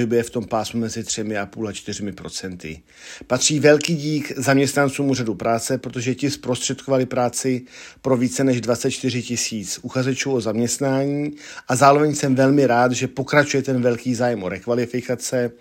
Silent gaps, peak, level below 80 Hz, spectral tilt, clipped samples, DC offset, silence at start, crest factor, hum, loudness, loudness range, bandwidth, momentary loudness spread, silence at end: none; 0 dBFS; -58 dBFS; -4.5 dB/octave; under 0.1%; under 0.1%; 0 s; 20 dB; none; -20 LUFS; 4 LU; 16.5 kHz; 13 LU; 0.05 s